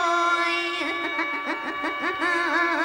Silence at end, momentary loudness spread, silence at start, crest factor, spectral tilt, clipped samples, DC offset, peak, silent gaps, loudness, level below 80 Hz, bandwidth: 0 s; 6 LU; 0 s; 14 dB; -2 dB/octave; under 0.1%; under 0.1%; -10 dBFS; none; -24 LUFS; -66 dBFS; 16 kHz